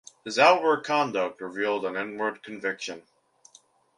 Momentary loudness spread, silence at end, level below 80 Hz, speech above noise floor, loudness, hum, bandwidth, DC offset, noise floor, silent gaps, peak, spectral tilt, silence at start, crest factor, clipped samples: 14 LU; 0.95 s; -76 dBFS; 34 dB; -26 LUFS; none; 11.5 kHz; under 0.1%; -59 dBFS; none; -4 dBFS; -3.5 dB/octave; 0.25 s; 22 dB; under 0.1%